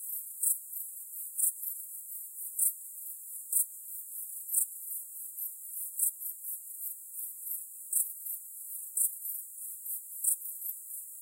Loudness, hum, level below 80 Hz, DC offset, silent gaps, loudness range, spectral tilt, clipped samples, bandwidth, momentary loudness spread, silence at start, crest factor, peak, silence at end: -33 LUFS; none; under -90 dBFS; under 0.1%; none; 2 LU; 6.5 dB/octave; under 0.1%; 16 kHz; 11 LU; 0 s; 24 dB; -12 dBFS; 0 s